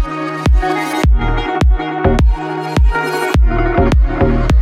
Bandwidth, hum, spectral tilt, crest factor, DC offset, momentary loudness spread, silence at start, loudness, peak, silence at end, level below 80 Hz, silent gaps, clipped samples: 13.5 kHz; none; -7 dB/octave; 12 dB; under 0.1%; 4 LU; 0 s; -15 LUFS; 0 dBFS; 0 s; -14 dBFS; none; under 0.1%